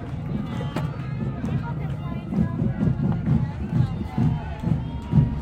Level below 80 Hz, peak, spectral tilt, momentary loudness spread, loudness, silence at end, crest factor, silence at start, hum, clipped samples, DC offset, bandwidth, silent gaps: -36 dBFS; -6 dBFS; -9.5 dB/octave; 7 LU; -26 LUFS; 0 s; 18 dB; 0 s; none; under 0.1%; under 0.1%; 8.4 kHz; none